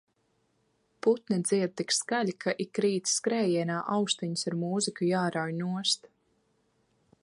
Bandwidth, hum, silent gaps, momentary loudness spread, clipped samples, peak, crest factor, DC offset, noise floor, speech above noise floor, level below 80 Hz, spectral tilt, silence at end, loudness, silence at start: 11.5 kHz; none; none; 4 LU; under 0.1%; -12 dBFS; 18 dB; under 0.1%; -73 dBFS; 44 dB; -78 dBFS; -4 dB/octave; 1.15 s; -29 LUFS; 1.05 s